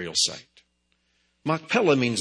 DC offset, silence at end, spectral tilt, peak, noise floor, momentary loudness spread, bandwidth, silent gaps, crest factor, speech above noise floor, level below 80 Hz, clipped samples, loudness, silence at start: under 0.1%; 0 s; -3.5 dB/octave; -6 dBFS; -71 dBFS; 13 LU; 10 kHz; none; 20 dB; 47 dB; -68 dBFS; under 0.1%; -24 LUFS; 0 s